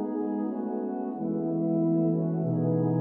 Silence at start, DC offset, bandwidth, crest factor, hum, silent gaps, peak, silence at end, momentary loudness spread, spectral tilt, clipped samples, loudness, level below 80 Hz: 0 s; under 0.1%; 2.1 kHz; 12 dB; none; none; -16 dBFS; 0 s; 6 LU; -14.5 dB/octave; under 0.1%; -28 LUFS; -74 dBFS